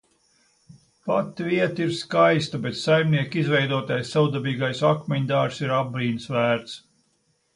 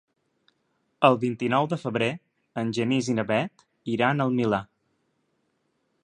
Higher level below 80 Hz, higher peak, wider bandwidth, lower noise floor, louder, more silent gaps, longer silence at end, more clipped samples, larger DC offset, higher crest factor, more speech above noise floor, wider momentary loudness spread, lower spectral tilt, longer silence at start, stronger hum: about the same, -64 dBFS vs -66 dBFS; about the same, -6 dBFS vs -4 dBFS; about the same, 11 kHz vs 10 kHz; second, -68 dBFS vs -73 dBFS; about the same, -23 LUFS vs -25 LUFS; neither; second, 0.75 s vs 1.4 s; neither; neither; about the same, 18 dB vs 22 dB; about the same, 46 dB vs 49 dB; second, 7 LU vs 11 LU; about the same, -6.5 dB/octave vs -6 dB/octave; about the same, 1.05 s vs 1 s; neither